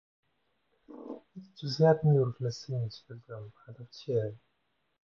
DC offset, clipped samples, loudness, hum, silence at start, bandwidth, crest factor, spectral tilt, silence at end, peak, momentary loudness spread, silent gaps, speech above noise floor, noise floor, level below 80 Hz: under 0.1%; under 0.1%; -30 LUFS; none; 0.9 s; 7.2 kHz; 22 dB; -7.5 dB/octave; 0.65 s; -12 dBFS; 24 LU; none; 48 dB; -78 dBFS; -70 dBFS